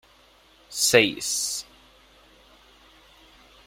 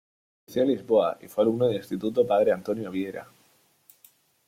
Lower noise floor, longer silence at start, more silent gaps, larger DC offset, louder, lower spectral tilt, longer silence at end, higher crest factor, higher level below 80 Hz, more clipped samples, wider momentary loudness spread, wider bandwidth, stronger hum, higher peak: second, -57 dBFS vs -64 dBFS; first, 0.7 s vs 0.5 s; neither; neither; first, -22 LUFS vs -26 LUFS; second, -1.5 dB/octave vs -7 dB/octave; first, 2.05 s vs 1.25 s; first, 26 dB vs 16 dB; first, -62 dBFS vs -68 dBFS; neither; first, 14 LU vs 10 LU; about the same, 16 kHz vs 16 kHz; neither; first, -2 dBFS vs -10 dBFS